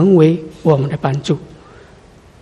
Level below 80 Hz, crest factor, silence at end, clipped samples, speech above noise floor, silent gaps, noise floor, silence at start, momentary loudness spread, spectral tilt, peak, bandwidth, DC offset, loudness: -48 dBFS; 16 dB; 0.95 s; under 0.1%; 30 dB; none; -43 dBFS; 0 s; 10 LU; -8.5 dB/octave; 0 dBFS; 10 kHz; under 0.1%; -15 LUFS